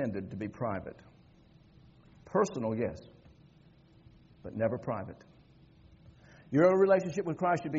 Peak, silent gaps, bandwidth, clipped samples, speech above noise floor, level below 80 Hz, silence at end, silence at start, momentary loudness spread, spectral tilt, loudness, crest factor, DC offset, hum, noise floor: -14 dBFS; none; 7.4 kHz; under 0.1%; 30 dB; -66 dBFS; 0 s; 0 s; 18 LU; -7 dB/octave; -31 LUFS; 20 dB; under 0.1%; none; -60 dBFS